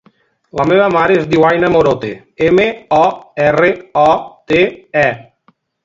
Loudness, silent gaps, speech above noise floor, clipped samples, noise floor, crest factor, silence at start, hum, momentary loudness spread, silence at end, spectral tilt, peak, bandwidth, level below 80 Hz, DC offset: -13 LUFS; none; 43 dB; under 0.1%; -55 dBFS; 14 dB; 0.55 s; none; 7 LU; 0.6 s; -6.5 dB/octave; 0 dBFS; 7.8 kHz; -46 dBFS; under 0.1%